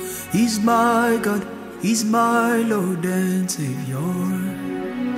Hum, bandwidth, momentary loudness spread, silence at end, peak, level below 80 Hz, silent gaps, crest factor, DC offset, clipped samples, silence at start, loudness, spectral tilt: none; 16 kHz; 9 LU; 0 s; -8 dBFS; -58 dBFS; none; 14 dB; under 0.1%; under 0.1%; 0 s; -21 LUFS; -5 dB/octave